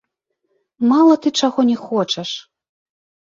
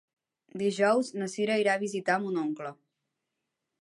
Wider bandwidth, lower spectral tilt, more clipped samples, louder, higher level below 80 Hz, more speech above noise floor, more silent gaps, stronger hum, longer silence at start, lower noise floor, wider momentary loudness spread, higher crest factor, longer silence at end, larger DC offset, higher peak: second, 7.6 kHz vs 11.5 kHz; about the same, -4.5 dB/octave vs -5 dB/octave; neither; first, -16 LUFS vs -29 LUFS; first, -68 dBFS vs -82 dBFS; about the same, 57 dB vs 56 dB; neither; neither; first, 0.8 s vs 0.55 s; second, -73 dBFS vs -85 dBFS; about the same, 11 LU vs 11 LU; about the same, 16 dB vs 20 dB; about the same, 0.95 s vs 1.05 s; neither; first, -2 dBFS vs -12 dBFS